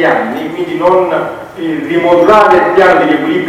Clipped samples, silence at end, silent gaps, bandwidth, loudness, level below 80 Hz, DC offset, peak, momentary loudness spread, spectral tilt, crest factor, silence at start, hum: 2%; 0 s; none; 14.5 kHz; -9 LUFS; -44 dBFS; under 0.1%; 0 dBFS; 12 LU; -6 dB/octave; 10 dB; 0 s; none